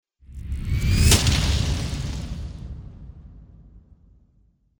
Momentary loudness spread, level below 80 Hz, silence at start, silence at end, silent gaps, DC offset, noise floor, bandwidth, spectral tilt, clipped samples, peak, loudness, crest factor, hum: 26 LU; -28 dBFS; 0.3 s; 1 s; none; under 0.1%; -61 dBFS; over 20 kHz; -4 dB/octave; under 0.1%; -4 dBFS; -22 LUFS; 20 dB; none